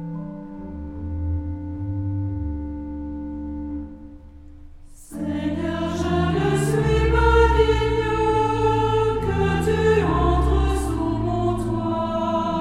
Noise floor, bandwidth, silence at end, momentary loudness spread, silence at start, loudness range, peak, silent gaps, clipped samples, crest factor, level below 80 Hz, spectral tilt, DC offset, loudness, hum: -42 dBFS; 13 kHz; 0 s; 14 LU; 0 s; 11 LU; -4 dBFS; none; under 0.1%; 18 dB; -28 dBFS; -7 dB/octave; under 0.1%; -22 LUFS; none